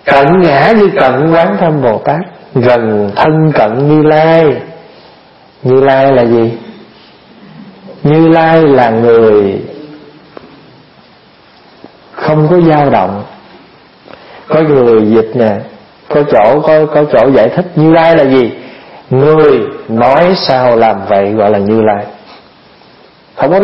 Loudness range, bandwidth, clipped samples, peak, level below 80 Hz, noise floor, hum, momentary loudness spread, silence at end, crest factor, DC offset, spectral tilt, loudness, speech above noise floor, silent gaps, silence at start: 5 LU; 5.8 kHz; 0.3%; 0 dBFS; -44 dBFS; -41 dBFS; none; 10 LU; 0 s; 8 dB; under 0.1%; -9 dB/octave; -8 LUFS; 34 dB; none; 0.05 s